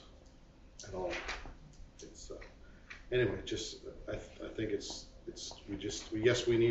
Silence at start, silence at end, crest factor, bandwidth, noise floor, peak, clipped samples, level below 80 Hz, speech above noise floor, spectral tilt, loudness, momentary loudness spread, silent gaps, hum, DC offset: 0 s; 0 s; 22 dB; 8 kHz; -58 dBFS; -16 dBFS; under 0.1%; -54 dBFS; 22 dB; -4.5 dB/octave; -38 LUFS; 22 LU; none; none; under 0.1%